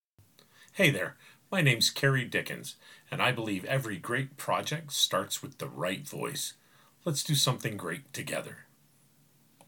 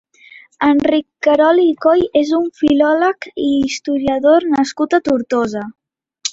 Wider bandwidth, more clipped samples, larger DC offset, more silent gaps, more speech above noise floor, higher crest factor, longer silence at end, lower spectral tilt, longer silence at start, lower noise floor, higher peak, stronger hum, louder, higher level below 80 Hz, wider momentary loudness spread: first, 19 kHz vs 8 kHz; neither; neither; neither; first, 34 dB vs 29 dB; first, 22 dB vs 14 dB; first, 1.05 s vs 0 s; about the same, -3.5 dB/octave vs -4.5 dB/octave; about the same, 0.6 s vs 0.6 s; first, -65 dBFS vs -43 dBFS; second, -10 dBFS vs 0 dBFS; neither; second, -30 LUFS vs -15 LUFS; second, -74 dBFS vs -50 dBFS; first, 13 LU vs 6 LU